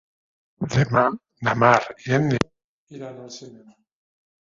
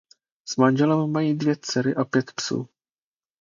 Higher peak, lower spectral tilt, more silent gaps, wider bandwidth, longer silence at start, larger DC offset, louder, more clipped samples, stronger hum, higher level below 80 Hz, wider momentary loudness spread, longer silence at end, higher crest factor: first, 0 dBFS vs -4 dBFS; about the same, -6.5 dB/octave vs -5.5 dB/octave; first, 2.64-2.87 s vs none; about the same, 7.6 kHz vs 7.6 kHz; first, 0.6 s vs 0.45 s; neither; about the same, -21 LUFS vs -23 LUFS; neither; neither; first, -54 dBFS vs -68 dBFS; first, 21 LU vs 11 LU; about the same, 0.85 s vs 0.75 s; about the same, 24 dB vs 20 dB